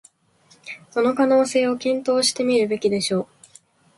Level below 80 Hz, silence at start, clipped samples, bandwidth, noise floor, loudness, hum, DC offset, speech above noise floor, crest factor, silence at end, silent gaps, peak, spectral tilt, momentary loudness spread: -66 dBFS; 0.65 s; under 0.1%; 11.5 kHz; -57 dBFS; -20 LUFS; none; under 0.1%; 38 dB; 16 dB; 0.75 s; none; -6 dBFS; -3.5 dB/octave; 12 LU